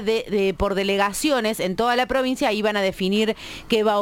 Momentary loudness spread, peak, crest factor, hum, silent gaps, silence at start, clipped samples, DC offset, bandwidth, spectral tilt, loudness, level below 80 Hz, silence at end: 3 LU; -6 dBFS; 16 dB; none; none; 0 s; under 0.1%; under 0.1%; 17 kHz; -4 dB/octave; -22 LUFS; -44 dBFS; 0 s